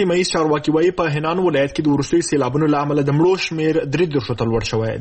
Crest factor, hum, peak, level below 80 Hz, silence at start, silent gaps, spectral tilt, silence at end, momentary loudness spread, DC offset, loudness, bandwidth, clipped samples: 14 dB; none; -4 dBFS; -44 dBFS; 0 s; none; -6 dB/octave; 0 s; 4 LU; under 0.1%; -18 LUFS; 8.8 kHz; under 0.1%